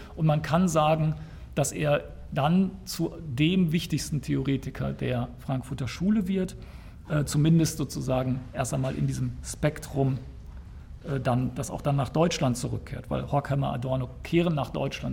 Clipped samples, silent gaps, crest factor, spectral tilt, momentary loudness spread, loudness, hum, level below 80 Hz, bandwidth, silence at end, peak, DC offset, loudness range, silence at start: under 0.1%; none; 18 dB; -6 dB/octave; 10 LU; -28 LUFS; none; -44 dBFS; 17 kHz; 0 s; -10 dBFS; under 0.1%; 3 LU; 0 s